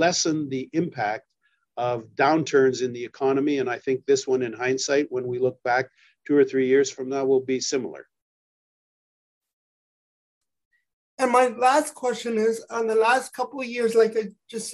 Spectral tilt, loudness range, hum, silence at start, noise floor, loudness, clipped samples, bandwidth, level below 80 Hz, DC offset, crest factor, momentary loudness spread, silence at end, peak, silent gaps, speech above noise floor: -4 dB/octave; 6 LU; none; 0 s; under -90 dBFS; -23 LUFS; under 0.1%; 12.5 kHz; -74 dBFS; under 0.1%; 18 dB; 9 LU; 0 s; -6 dBFS; 8.22-9.41 s, 9.53-10.41 s, 10.65-10.71 s, 10.93-11.17 s; over 67 dB